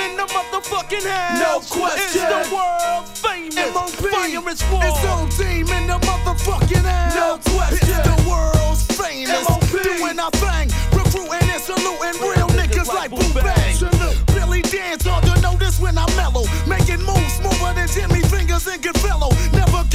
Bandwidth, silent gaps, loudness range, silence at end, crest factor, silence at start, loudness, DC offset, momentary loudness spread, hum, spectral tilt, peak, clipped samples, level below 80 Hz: 16 kHz; none; 2 LU; 0 s; 16 dB; 0 s; -18 LUFS; under 0.1%; 4 LU; none; -4.5 dB/octave; 0 dBFS; under 0.1%; -20 dBFS